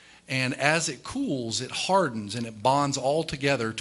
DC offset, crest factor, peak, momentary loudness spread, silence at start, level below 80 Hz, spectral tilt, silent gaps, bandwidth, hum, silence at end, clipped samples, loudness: under 0.1%; 22 dB; -4 dBFS; 7 LU; 0.3 s; -58 dBFS; -4 dB/octave; none; 12 kHz; none; 0 s; under 0.1%; -26 LUFS